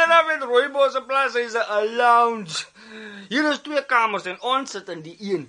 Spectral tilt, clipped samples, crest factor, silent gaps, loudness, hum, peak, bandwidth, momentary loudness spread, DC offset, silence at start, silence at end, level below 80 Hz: -3 dB/octave; under 0.1%; 18 dB; none; -21 LUFS; none; -2 dBFS; 10.5 kHz; 17 LU; under 0.1%; 0 s; 0.05 s; -74 dBFS